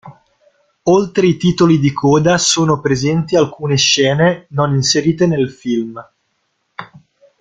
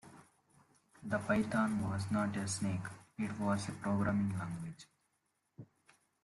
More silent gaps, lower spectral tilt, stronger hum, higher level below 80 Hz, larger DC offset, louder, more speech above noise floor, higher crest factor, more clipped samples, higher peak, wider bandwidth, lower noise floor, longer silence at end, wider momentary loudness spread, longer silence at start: neither; second, -4.5 dB/octave vs -6 dB/octave; neither; first, -50 dBFS vs -66 dBFS; neither; first, -14 LUFS vs -37 LUFS; first, 53 dB vs 46 dB; about the same, 14 dB vs 18 dB; neither; first, 0 dBFS vs -20 dBFS; second, 9.4 kHz vs 12 kHz; second, -67 dBFS vs -82 dBFS; about the same, 0.55 s vs 0.6 s; second, 11 LU vs 17 LU; about the same, 0.05 s vs 0.05 s